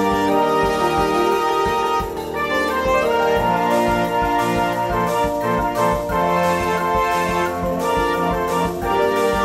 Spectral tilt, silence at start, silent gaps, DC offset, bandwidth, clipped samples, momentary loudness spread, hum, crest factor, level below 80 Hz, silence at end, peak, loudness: -5 dB/octave; 0 s; none; 0.1%; 16 kHz; under 0.1%; 3 LU; none; 14 dB; -36 dBFS; 0 s; -6 dBFS; -19 LUFS